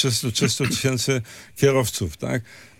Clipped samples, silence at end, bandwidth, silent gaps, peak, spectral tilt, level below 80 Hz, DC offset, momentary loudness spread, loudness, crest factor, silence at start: under 0.1%; 0.15 s; 17 kHz; none; -4 dBFS; -4 dB/octave; -52 dBFS; under 0.1%; 8 LU; -22 LUFS; 18 dB; 0 s